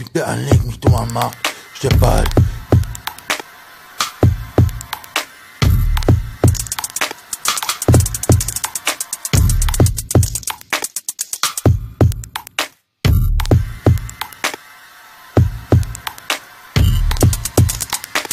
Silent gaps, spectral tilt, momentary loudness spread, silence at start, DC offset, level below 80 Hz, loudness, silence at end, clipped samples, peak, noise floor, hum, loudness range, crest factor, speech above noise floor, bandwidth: none; -4.5 dB/octave; 8 LU; 0 s; under 0.1%; -24 dBFS; -17 LUFS; 0 s; under 0.1%; 0 dBFS; -41 dBFS; none; 3 LU; 16 dB; 27 dB; 16 kHz